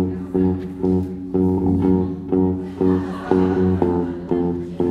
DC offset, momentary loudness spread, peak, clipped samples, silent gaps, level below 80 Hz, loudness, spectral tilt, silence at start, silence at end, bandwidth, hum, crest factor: under 0.1%; 5 LU; -2 dBFS; under 0.1%; none; -42 dBFS; -20 LUFS; -10.5 dB/octave; 0 s; 0 s; 5.4 kHz; none; 18 dB